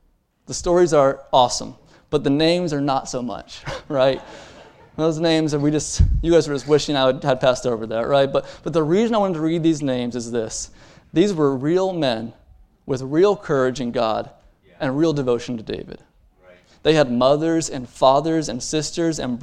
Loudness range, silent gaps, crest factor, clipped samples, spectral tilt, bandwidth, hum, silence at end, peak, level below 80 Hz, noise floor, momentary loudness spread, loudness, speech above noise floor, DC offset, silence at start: 3 LU; none; 20 dB; under 0.1%; -5.5 dB/octave; 11 kHz; none; 0 s; 0 dBFS; -36 dBFS; -51 dBFS; 11 LU; -20 LUFS; 32 dB; under 0.1%; 0.5 s